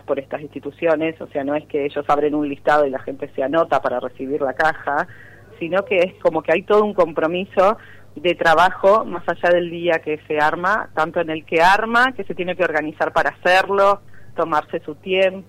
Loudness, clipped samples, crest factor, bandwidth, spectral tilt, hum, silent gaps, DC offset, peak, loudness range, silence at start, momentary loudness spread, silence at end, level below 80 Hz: -19 LUFS; under 0.1%; 14 dB; 15.5 kHz; -5.5 dB/octave; none; none; under 0.1%; -4 dBFS; 3 LU; 0.1 s; 11 LU; 0.05 s; -50 dBFS